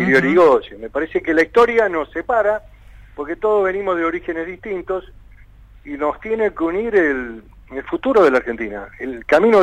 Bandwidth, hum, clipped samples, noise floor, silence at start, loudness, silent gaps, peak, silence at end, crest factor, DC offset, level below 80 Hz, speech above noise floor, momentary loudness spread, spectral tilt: 10 kHz; none; under 0.1%; -44 dBFS; 0 s; -18 LUFS; none; -4 dBFS; 0 s; 14 dB; under 0.1%; -44 dBFS; 26 dB; 15 LU; -6.5 dB/octave